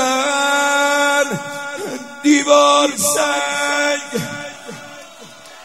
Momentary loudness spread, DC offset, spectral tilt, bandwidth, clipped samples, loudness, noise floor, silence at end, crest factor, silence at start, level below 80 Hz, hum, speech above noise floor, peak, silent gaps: 19 LU; 0.3%; -2 dB/octave; 16 kHz; under 0.1%; -16 LUFS; -39 dBFS; 0 s; 18 dB; 0 s; -66 dBFS; none; 25 dB; 0 dBFS; none